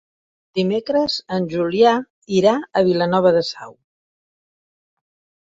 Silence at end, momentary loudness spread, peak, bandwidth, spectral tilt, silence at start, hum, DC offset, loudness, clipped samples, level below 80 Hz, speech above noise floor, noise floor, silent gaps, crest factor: 1.75 s; 8 LU; -2 dBFS; 7.8 kHz; -6 dB/octave; 0.55 s; none; under 0.1%; -18 LUFS; under 0.1%; -60 dBFS; over 72 dB; under -90 dBFS; 2.10-2.22 s; 18 dB